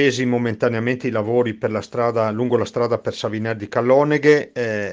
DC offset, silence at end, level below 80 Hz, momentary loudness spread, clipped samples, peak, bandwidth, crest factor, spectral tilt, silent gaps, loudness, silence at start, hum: under 0.1%; 0 s; -62 dBFS; 8 LU; under 0.1%; -2 dBFS; 9.2 kHz; 18 dB; -6.5 dB/octave; none; -20 LUFS; 0 s; none